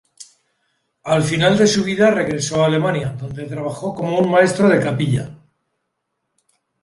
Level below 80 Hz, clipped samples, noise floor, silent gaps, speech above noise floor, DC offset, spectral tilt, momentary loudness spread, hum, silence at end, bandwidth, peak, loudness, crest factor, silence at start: -52 dBFS; under 0.1%; -74 dBFS; none; 58 dB; under 0.1%; -5.5 dB/octave; 12 LU; none; 1.45 s; 11.5 kHz; -2 dBFS; -17 LUFS; 16 dB; 0.2 s